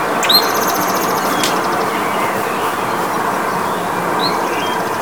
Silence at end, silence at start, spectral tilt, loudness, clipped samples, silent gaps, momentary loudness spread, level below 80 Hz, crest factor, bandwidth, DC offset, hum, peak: 0 s; 0 s; -2.5 dB/octave; -16 LUFS; under 0.1%; none; 7 LU; -54 dBFS; 16 dB; 19.5 kHz; 0.6%; none; 0 dBFS